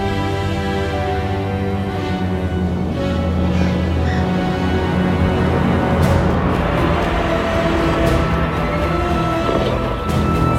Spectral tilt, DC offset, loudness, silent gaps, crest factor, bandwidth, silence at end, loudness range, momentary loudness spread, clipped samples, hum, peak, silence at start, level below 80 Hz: -7 dB/octave; under 0.1%; -18 LUFS; none; 16 dB; 15 kHz; 0 s; 3 LU; 4 LU; under 0.1%; none; -2 dBFS; 0 s; -26 dBFS